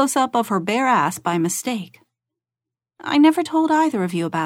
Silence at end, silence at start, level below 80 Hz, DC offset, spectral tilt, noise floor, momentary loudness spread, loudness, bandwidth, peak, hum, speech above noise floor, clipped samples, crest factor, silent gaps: 0 s; 0 s; -70 dBFS; under 0.1%; -4.5 dB/octave; -88 dBFS; 11 LU; -19 LUFS; 16.5 kHz; -4 dBFS; none; 69 dB; under 0.1%; 16 dB; none